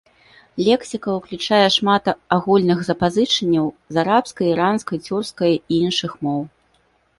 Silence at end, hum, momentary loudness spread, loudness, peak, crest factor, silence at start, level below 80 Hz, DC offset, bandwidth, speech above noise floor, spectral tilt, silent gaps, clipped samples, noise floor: 0.7 s; none; 8 LU; -19 LUFS; 0 dBFS; 18 dB; 0.55 s; -54 dBFS; under 0.1%; 11.5 kHz; 43 dB; -5 dB/octave; none; under 0.1%; -61 dBFS